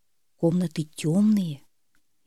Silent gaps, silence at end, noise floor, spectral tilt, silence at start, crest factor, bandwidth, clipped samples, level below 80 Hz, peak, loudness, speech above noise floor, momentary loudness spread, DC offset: none; 0.7 s; -71 dBFS; -7.5 dB/octave; 0.4 s; 16 dB; 13 kHz; under 0.1%; -68 dBFS; -10 dBFS; -25 LUFS; 48 dB; 11 LU; under 0.1%